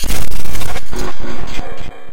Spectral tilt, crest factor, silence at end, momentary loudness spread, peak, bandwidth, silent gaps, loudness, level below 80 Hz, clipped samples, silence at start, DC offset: -4 dB/octave; 6 dB; 0 s; 6 LU; 0 dBFS; 17.5 kHz; none; -26 LUFS; -24 dBFS; 5%; 0 s; under 0.1%